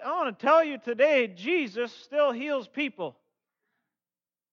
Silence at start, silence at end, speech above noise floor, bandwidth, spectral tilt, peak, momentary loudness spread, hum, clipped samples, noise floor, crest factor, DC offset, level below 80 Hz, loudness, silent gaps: 0 s; 1.4 s; over 64 dB; 7 kHz; -5 dB/octave; -10 dBFS; 10 LU; none; under 0.1%; under -90 dBFS; 18 dB; under 0.1%; under -90 dBFS; -26 LUFS; none